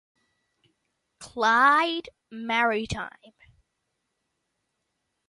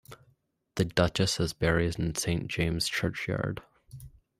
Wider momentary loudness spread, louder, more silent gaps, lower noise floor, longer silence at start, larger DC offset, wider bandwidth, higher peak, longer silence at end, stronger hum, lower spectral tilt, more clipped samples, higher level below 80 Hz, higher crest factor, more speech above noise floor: first, 21 LU vs 15 LU; first, -23 LUFS vs -29 LUFS; neither; first, -79 dBFS vs -69 dBFS; first, 1.2 s vs 0.1 s; neither; second, 11.5 kHz vs 15.5 kHz; about the same, -8 dBFS vs -8 dBFS; first, 2.2 s vs 0.3 s; neither; about the same, -4 dB/octave vs -4.5 dB/octave; neither; second, -58 dBFS vs -48 dBFS; about the same, 20 dB vs 22 dB; first, 54 dB vs 40 dB